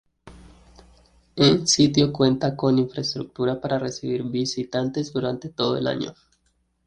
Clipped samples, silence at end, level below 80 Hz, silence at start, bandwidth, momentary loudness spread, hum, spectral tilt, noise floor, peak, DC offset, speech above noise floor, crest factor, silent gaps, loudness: under 0.1%; 0.75 s; -54 dBFS; 0.25 s; 9.8 kHz; 10 LU; none; -5 dB/octave; -68 dBFS; -4 dBFS; under 0.1%; 46 dB; 20 dB; none; -22 LUFS